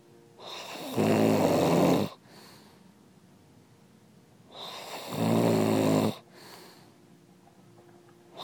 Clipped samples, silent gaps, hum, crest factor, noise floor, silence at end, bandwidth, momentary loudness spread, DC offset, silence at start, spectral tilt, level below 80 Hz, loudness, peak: under 0.1%; none; none; 20 dB; -58 dBFS; 0 s; 19 kHz; 24 LU; under 0.1%; 0.4 s; -6 dB/octave; -70 dBFS; -27 LUFS; -10 dBFS